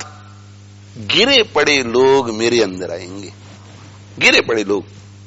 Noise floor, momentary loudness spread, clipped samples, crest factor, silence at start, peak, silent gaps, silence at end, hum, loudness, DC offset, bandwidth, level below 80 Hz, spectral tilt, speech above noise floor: -39 dBFS; 20 LU; under 0.1%; 18 dB; 0 s; 0 dBFS; none; 0 s; 50 Hz at -40 dBFS; -13 LUFS; under 0.1%; 8.2 kHz; -52 dBFS; -3 dB/octave; 24 dB